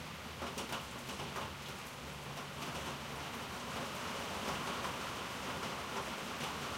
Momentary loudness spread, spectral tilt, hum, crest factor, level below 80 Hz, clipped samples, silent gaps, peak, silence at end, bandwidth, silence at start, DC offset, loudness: 5 LU; -3 dB/octave; none; 16 dB; -60 dBFS; under 0.1%; none; -26 dBFS; 0 s; 16 kHz; 0 s; under 0.1%; -42 LUFS